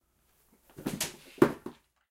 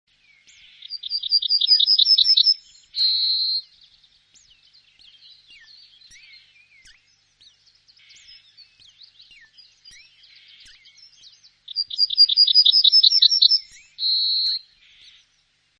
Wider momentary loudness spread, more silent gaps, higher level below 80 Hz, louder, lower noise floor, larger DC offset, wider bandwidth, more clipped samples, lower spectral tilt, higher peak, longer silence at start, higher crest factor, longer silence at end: about the same, 16 LU vs 15 LU; neither; first, -64 dBFS vs -70 dBFS; second, -31 LUFS vs -15 LUFS; first, -70 dBFS vs -65 dBFS; neither; first, 16 kHz vs 10 kHz; neither; first, -4.5 dB/octave vs 4 dB/octave; second, -6 dBFS vs -2 dBFS; about the same, 0.8 s vs 0.9 s; first, 30 dB vs 20 dB; second, 0.4 s vs 1.2 s